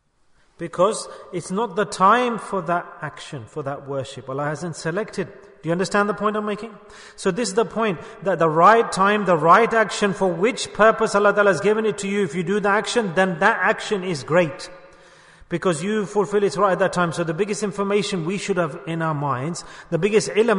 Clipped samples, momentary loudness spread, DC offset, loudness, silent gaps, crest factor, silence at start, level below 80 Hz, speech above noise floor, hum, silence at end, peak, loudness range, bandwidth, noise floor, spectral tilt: under 0.1%; 14 LU; under 0.1%; -20 LUFS; none; 18 dB; 0.6 s; -56 dBFS; 38 dB; none; 0 s; -2 dBFS; 8 LU; 11 kHz; -59 dBFS; -5 dB/octave